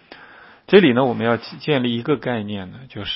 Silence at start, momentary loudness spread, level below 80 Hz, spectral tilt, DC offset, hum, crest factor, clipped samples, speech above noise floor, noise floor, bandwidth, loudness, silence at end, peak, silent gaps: 0.1 s; 17 LU; -56 dBFS; -10.5 dB/octave; under 0.1%; none; 20 dB; under 0.1%; 27 dB; -45 dBFS; 5.8 kHz; -18 LUFS; 0 s; 0 dBFS; none